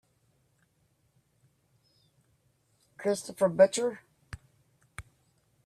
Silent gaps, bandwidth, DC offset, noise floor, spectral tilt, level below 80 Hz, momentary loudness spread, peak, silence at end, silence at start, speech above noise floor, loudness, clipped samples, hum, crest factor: none; 13.5 kHz; under 0.1%; -72 dBFS; -4.5 dB/octave; -64 dBFS; 26 LU; -10 dBFS; 0.65 s; 3 s; 45 dB; -27 LUFS; under 0.1%; none; 24 dB